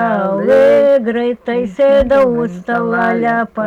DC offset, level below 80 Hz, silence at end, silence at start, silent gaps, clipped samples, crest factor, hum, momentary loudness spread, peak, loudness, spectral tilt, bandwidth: under 0.1%; -40 dBFS; 0 s; 0 s; none; under 0.1%; 8 dB; none; 9 LU; -4 dBFS; -13 LUFS; -7.5 dB/octave; 7.6 kHz